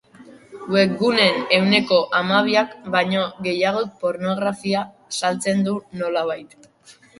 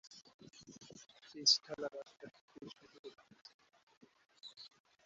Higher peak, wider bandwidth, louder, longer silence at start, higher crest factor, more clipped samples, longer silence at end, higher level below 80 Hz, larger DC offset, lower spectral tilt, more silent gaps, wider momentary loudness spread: first, 0 dBFS vs -16 dBFS; first, 11.5 kHz vs 8 kHz; first, -20 LUFS vs -34 LUFS; first, 0.2 s vs 0.05 s; second, 20 dB vs 28 dB; neither; about the same, 0.3 s vs 0.4 s; first, -64 dBFS vs -88 dBFS; neither; first, -4.5 dB/octave vs -0.5 dB/octave; second, none vs 0.34-0.39 s, 2.41-2.48 s, 2.99-3.04 s, 3.54-3.59 s, 3.83-3.87 s, 3.97-4.01 s; second, 9 LU vs 28 LU